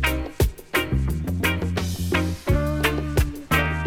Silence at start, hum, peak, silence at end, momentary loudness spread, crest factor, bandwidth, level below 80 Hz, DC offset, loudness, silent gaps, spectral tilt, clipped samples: 0 s; none; -8 dBFS; 0 s; 3 LU; 14 dB; 18 kHz; -28 dBFS; under 0.1%; -24 LUFS; none; -5.5 dB/octave; under 0.1%